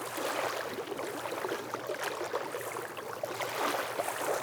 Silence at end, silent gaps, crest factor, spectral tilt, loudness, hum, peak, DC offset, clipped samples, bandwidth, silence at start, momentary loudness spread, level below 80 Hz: 0 s; none; 18 dB; -2.5 dB/octave; -35 LUFS; none; -18 dBFS; under 0.1%; under 0.1%; over 20 kHz; 0 s; 6 LU; -82 dBFS